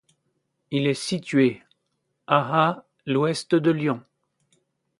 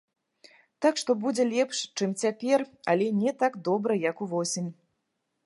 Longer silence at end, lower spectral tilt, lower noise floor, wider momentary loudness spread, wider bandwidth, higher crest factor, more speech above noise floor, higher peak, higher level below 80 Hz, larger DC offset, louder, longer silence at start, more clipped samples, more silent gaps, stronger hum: first, 1 s vs 0.7 s; first, -6 dB/octave vs -4.5 dB/octave; about the same, -76 dBFS vs -79 dBFS; first, 8 LU vs 5 LU; about the same, 11.5 kHz vs 11.5 kHz; about the same, 22 dB vs 18 dB; about the same, 54 dB vs 53 dB; first, -4 dBFS vs -10 dBFS; first, -70 dBFS vs -82 dBFS; neither; first, -23 LUFS vs -27 LUFS; about the same, 0.7 s vs 0.8 s; neither; neither; neither